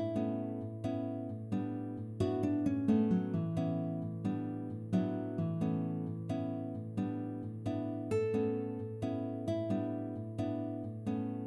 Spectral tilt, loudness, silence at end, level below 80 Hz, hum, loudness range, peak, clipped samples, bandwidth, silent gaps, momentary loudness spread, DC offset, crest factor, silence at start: -9.5 dB/octave; -37 LUFS; 0 s; -66 dBFS; none; 3 LU; -18 dBFS; under 0.1%; 11.5 kHz; none; 7 LU; under 0.1%; 18 dB; 0 s